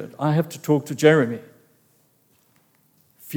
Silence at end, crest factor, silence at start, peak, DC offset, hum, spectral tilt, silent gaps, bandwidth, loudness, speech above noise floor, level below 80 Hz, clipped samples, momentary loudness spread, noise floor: 0 s; 22 dB; 0 s; -2 dBFS; under 0.1%; none; -6.5 dB/octave; none; over 20 kHz; -20 LUFS; 42 dB; -74 dBFS; under 0.1%; 9 LU; -62 dBFS